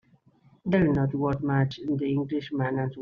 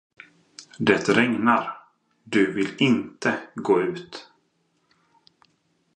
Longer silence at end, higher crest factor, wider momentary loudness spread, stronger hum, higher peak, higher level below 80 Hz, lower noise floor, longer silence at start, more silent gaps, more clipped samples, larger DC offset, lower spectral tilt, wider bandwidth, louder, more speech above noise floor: second, 0 s vs 1.75 s; second, 18 dB vs 24 dB; second, 6 LU vs 21 LU; neither; second, -10 dBFS vs -2 dBFS; first, -54 dBFS vs -68 dBFS; second, -61 dBFS vs -69 dBFS; about the same, 0.65 s vs 0.6 s; neither; neither; neither; first, -7.5 dB/octave vs -5.5 dB/octave; second, 6.4 kHz vs 9.4 kHz; second, -27 LUFS vs -22 LUFS; second, 35 dB vs 47 dB